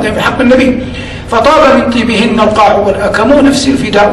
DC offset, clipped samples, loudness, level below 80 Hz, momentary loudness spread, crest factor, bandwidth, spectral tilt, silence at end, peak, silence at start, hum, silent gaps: under 0.1%; 0.2%; -8 LUFS; -30 dBFS; 6 LU; 8 dB; 13 kHz; -5 dB/octave; 0 s; 0 dBFS; 0 s; none; none